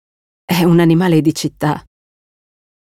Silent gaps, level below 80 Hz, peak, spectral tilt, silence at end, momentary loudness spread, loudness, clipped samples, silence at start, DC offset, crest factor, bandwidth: none; -52 dBFS; -2 dBFS; -6.5 dB/octave; 1 s; 9 LU; -14 LUFS; under 0.1%; 0.5 s; under 0.1%; 14 dB; 16 kHz